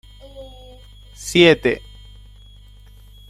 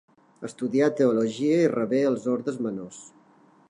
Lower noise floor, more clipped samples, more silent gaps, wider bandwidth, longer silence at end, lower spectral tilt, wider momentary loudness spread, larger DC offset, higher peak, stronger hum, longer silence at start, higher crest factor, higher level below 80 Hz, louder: second, -44 dBFS vs -58 dBFS; neither; neither; first, 14 kHz vs 11 kHz; first, 1.5 s vs 0.6 s; second, -4.5 dB/octave vs -6.5 dB/octave; first, 27 LU vs 18 LU; neither; first, -2 dBFS vs -10 dBFS; first, 50 Hz at -40 dBFS vs none; about the same, 0.35 s vs 0.4 s; about the same, 20 dB vs 16 dB; first, -44 dBFS vs -76 dBFS; first, -16 LUFS vs -24 LUFS